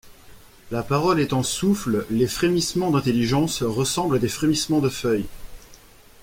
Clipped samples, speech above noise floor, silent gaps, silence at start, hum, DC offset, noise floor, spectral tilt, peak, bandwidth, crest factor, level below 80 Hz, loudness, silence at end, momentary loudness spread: under 0.1%; 26 dB; none; 0.05 s; none; under 0.1%; -48 dBFS; -5 dB/octave; -6 dBFS; 16.5 kHz; 16 dB; -46 dBFS; -22 LUFS; 0.45 s; 4 LU